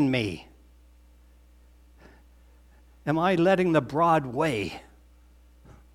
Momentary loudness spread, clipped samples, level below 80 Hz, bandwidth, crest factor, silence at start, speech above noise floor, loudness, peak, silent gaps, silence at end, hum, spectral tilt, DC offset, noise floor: 15 LU; under 0.1%; -54 dBFS; 14.5 kHz; 20 dB; 0 s; 31 dB; -25 LUFS; -8 dBFS; none; 0.2 s; 60 Hz at -55 dBFS; -7 dB/octave; under 0.1%; -55 dBFS